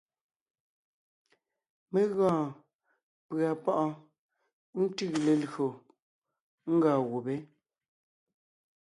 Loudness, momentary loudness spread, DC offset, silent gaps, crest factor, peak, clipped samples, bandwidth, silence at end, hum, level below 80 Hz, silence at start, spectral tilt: -30 LUFS; 12 LU; under 0.1%; 2.75-2.79 s, 3.03-3.29 s, 4.18-4.29 s, 4.53-4.73 s, 6.02-6.22 s, 6.41-6.58 s; 20 dB; -14 dBFS; under 0.1%; 11.5 kHz; 1.35 s; none; -78 dBFS; 1.9 s; -7 dB/octave